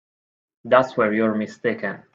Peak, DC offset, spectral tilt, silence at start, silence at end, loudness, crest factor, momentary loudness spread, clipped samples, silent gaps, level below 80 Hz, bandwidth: -2 dBFS; under 0.1%; -7 dB/octave; 0.65 s; 0.2 s; -21 LUFS; 22 dB; 7 LU; under 0.1%; none; -68 dBFS; 7.6 kHz